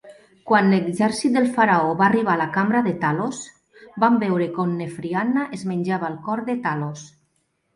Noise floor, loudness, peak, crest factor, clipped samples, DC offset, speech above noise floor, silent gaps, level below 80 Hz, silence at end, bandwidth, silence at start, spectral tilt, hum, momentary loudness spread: -69 dBFS; -21 LUFS; -4 dBFS; 18 dB; under 0.1%; under 0.1%; 49 dB; none; -64 dBFS; 0.7 s; 11.5 kHz; 0.05 s; -6.5 dB/octave; none; 11 LU